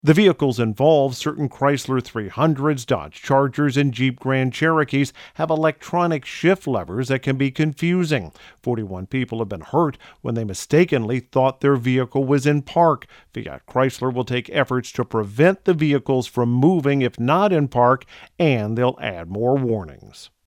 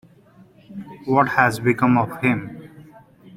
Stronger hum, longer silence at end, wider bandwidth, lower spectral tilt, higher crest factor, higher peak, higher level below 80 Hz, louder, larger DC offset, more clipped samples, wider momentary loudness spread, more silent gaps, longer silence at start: neither; first, 0.2 s vs 0 s; about the same, 15.5 kHz vs 16 kHz; about the same, -6.5 dB/octave vs -7 dB/octave; about the same, 18 dB vs 20 dB; about the same, -2 dBFS vs -2 dBFS; about the same, -56 dBFS vs -58 dBFS; about the same, -20 LUFS vs -19 LUFS; neither; neither; second, 9 LU vs 21 LU; neither; second, 0.05 s vs 0.7 s